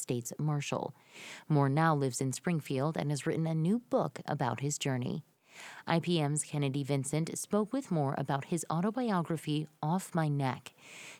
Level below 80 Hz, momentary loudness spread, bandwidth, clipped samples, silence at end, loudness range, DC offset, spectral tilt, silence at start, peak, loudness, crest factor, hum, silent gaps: -74 dBFS; 11 LU; 15.5 kHz; under 0.1%; 0 s; 2 LU; under 0.1%; -5.5 dB/octave; 0 s; -14 dBFS; -33 LUFS; 20 dB; none; none